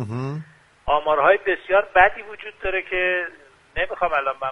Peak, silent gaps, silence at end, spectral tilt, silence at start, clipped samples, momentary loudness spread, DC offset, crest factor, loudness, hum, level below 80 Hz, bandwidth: 0 dBFS; none; 0 s; -6.5 dB/octave; 0 s; under 0.1%; 16 LU; under 0.1%; 22 dB; -21 LUFS; none; -44 dBFS; 9.2 kHz